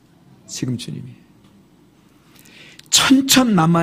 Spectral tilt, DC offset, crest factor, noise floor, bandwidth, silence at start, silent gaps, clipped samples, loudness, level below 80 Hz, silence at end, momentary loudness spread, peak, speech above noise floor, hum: -3.5 dB/octave; under 0.1%; 20 dB; -52 dBFS; 15.5 kHz; 0.5 s; none; under 0.1%; -15 LUFS; -54 dBFS; 0 s; 19 LU; 0 dBFS; 36 dB; none